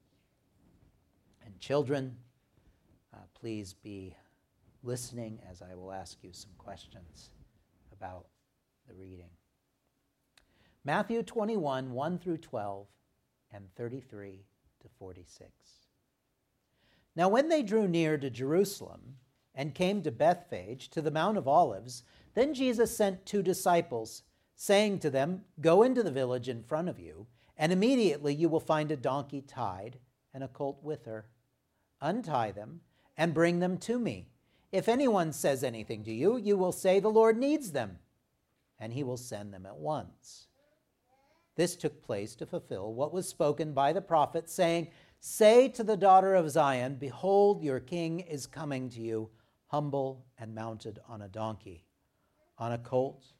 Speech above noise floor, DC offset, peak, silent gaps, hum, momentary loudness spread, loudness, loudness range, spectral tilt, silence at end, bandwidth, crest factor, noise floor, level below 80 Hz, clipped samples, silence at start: 48 dB; under 0.1%; -10 dBFS; none; none; 21 LU; -31 LUFS; 17 LU; -5.5 dB/octave; 0.25 s; 16 kHz; 22 dB; -79 dBFS; -70 dBFS; under 0.1%; 1.45 s